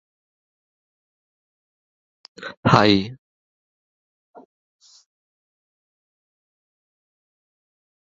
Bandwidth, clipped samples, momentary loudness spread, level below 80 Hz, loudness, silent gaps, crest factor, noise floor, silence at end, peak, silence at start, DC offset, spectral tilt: 7.6 kHz; under 0.1%; 22 LU; -56 dBFS; -17 LUFS; 2.57-2.63 s; 26 dB; under -90 dBFS; 4.85 s; -2 dBFS; 2.4 s; under 0.1%; -4.5 dB/octave